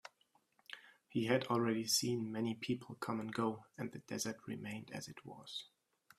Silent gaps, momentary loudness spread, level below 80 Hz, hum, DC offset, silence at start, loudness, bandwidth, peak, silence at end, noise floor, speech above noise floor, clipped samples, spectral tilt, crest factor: none; 19 LU; -80 dBFS; none; under 0.1%; 0.05 s; -40 LUFS; 15.5 kHz; -18 dBFS; 0.55 s; -76 dBFS; 36 dB; under 0.1%; -4 dB/octave; 22 dB